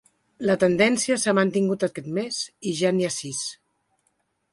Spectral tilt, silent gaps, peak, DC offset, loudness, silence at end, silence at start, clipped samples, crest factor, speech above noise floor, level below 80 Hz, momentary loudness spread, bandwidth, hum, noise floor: -4 dB/octave; none; -4 dBFS; under 0.1%; -23 LUFS; 1 s; 0.4 s; under 0.1%; 20 dB; 49 dB; -64 dBFS; 10 LU; 11.5 kHz; none; -72 dBFS